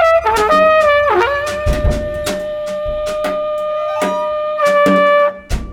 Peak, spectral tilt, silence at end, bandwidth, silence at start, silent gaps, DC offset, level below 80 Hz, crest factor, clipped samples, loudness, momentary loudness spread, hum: -4 dBFS; -5 dB/octave; 0 s; 17 kHz; 0 s; none; under 0.1%; -28 dBFS; 12 dB; under 0.1%; -14 LUFS; 10 LU; none